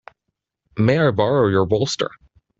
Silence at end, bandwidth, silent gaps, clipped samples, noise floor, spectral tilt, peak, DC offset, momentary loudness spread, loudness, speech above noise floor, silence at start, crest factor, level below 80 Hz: 0.5 s; 8 kHz; none; under 0.1%; -78 dBFS; -6 dB/octave; -4 dBFS; under 0.1%; 9 LU; -19 LUFS; 61 dB; 0.75 s; 16 dB; -52 dBFS